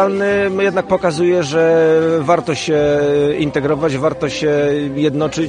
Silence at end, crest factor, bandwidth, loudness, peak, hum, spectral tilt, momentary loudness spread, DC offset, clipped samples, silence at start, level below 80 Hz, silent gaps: 0 s; 14 dB; 10 kHz; -15 LUFS; 0 dBFS; none; -6 dB/octave; 5 LU; under 0.1%; under 0.1%; 0 s; -46 dBFS; none